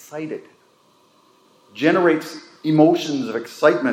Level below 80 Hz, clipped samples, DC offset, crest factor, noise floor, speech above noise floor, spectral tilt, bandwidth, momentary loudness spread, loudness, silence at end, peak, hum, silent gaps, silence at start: -78 dBFS; under 0.1%; under 0.1%; 20 dB; -57 dBFS; 38 dB; -6 dB/octave; 15 kHz; 18 LU; -19 LUFS; 0 s; -2 dBFS; none; none; 0.1 s